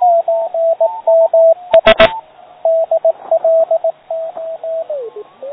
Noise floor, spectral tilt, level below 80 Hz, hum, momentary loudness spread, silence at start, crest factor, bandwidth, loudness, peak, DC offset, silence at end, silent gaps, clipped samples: -32 dBFS; -6 dB/octave; -44 dBFS; none; 15 LU; 0 s; 14 dB; 5.4 kHz; -13 LUFS; 0 dBFS; under 0.1%; 0 s; none; 0.2%